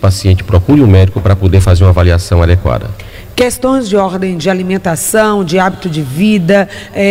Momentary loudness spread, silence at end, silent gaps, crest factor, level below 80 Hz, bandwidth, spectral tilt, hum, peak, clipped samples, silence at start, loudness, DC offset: 9 LU; 0 s; none; 10 dB; -24 dBFS; 16 kHz; -6.5 dB/octave; none; 0 dBFS; under 0.1%; 0 s; -10 LUFS; under 0.1%